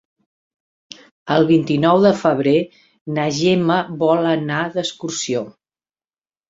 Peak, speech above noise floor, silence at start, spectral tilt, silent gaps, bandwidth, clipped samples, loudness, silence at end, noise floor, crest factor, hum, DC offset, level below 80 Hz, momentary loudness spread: -2 dBFS; over 73 dB; 1.25 s; -5.5 dB/octave; 3.01-3.06 s; 7.8 kHz; under 0.1%; -18 LUFS; 1 s; under -90 dBFS; 18 dB; none; under 0.1%; -60 dBFS; 11 LU